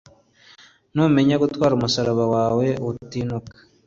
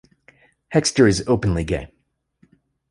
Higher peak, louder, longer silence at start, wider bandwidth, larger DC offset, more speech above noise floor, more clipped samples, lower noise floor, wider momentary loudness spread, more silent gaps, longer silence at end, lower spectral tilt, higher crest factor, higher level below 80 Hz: about the same, -4 dBFS vs -2 dBFS; about the same, -21 LUFS vs -19 LUFS; first, 0.95 s vs 0.7 s; second, 7.8 kHz vs 11.5 kHz; neither; second, 32 dB vs 42 dB; neither; second, -52 dBFS vs -61 dBFS; about the same, 11 LU vs 10 LU; neither; second, 0.35 s vs 1.05 s; first, -6.5 dB/octave vs -5 dB/octave; about the same, 16 dB vs 20 dB; second, -52 dBFS vs -38 dBFS